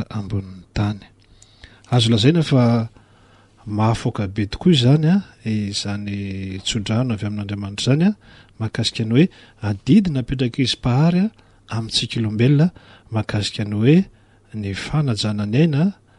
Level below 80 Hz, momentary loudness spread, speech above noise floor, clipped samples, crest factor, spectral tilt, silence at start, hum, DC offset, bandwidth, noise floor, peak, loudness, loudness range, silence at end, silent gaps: -44 dBFS; 12 LU; 33 dB; under 0.1%; 16 dB; -6.5 dB/octave; 0 s; none; under 0.1%; 11.5 kHz; -51 dBFS; -2 dBFS; -20 LUFS; 3 LU; 0.25 s; none